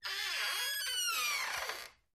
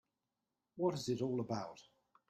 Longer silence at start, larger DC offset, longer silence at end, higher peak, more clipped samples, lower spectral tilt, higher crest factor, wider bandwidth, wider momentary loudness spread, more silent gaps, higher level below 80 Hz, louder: second, 0 s vs 0.75 s; neither; second, 0.25 s vs 0.45 s; about the same, -22 dBFS vs -22 dBFS; neither; second, 3 dB/octave vs -6.5 dB/octave; second, 14 dB vs 20 dB; first, 15.5 kHz vs 13.5 kHz; second, 7 LU vs 19 LU; neither; first, -72 dBFS vs -78 dBFS; first, -34 LUFS vs -39 LUFS